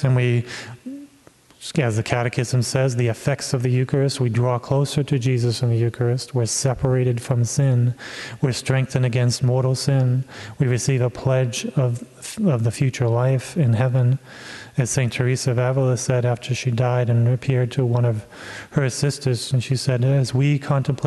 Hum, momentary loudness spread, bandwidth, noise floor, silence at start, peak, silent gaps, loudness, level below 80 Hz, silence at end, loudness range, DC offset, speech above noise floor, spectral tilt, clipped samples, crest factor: none; 7 LU; 12 kHz; -52 dBFS; 0 s; -2 dBFS; none; -21 LUFS; -52 dBFS; 0 s; 1 LU; under 0.1%; 32 dB; -6 dB/octave; under 0.1%; 18 dB